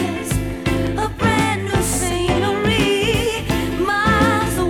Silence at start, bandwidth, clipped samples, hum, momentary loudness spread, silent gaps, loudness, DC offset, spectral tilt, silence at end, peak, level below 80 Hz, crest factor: 0 s; 19.5 kHz; under 0.1%; none; 6 LU; none; -18 LUFS; under 0.1%; -4.5 dB/octave; 0 s; -6 dBFS; -30 dBFS; 12 dB